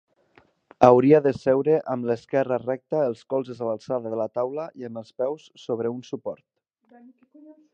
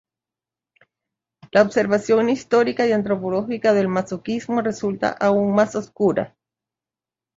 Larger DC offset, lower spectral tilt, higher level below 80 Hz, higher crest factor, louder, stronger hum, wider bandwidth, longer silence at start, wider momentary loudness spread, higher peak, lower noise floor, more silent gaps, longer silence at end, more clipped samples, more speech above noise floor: neither; first, -8 dB/octave vs -6 dB/octave; second, -66 dBFS vs -60 dBFS; first, 24 dB vs 18 dB; second, -23 LUFS vs -20 LUFS; neither; about the same, 7.8 kHz vs 7.8 kHz; second, 0.8 s vs 1.55 s; first, 17 LU vs 7 LU; about the same, 0 dBFS vs -2 dBFS; second, -60 dBFS vs -90 dBFS; neither; second, 0.2 s vs 1.1 s; neither; second, 37 dB vs 70 dB